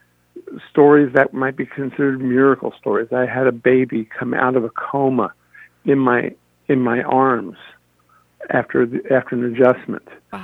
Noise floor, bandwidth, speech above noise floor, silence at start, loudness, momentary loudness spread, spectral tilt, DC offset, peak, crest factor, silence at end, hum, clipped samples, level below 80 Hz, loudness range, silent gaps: -57 dBFS; 4 kHz; 40 dB; 0.35 s; -18 LUFS; 12 LU; -9.5 dB/octave; under 0.1%; 0 dBFS; 18 dB; 0 s; 60 Hz at -45 dBFS; under 0.1%; -62 dBFS; 3 LU; none